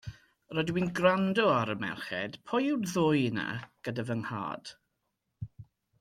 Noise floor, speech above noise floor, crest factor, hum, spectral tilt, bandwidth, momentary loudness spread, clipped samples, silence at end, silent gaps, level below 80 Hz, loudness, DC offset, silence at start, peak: -82 dBFS; 51 dB; 20 dB; none; -6 dB/octave; 16 kHz; 19 LU; under 0.1%; 0.4 s; none; -64 dBFS; -30 LUFS; under 0.1%; 0.05 s; -12 dBFS